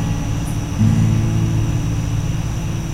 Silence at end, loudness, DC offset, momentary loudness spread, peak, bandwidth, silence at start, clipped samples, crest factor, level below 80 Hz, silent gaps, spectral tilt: 0 s; -19 LUFS; under 0.1%; 7 LU; -4 dBFS; 14.5 kHz; 0 s; under 0.1%; 14 dB; -26 dBFS; none; -6.5 dB/octave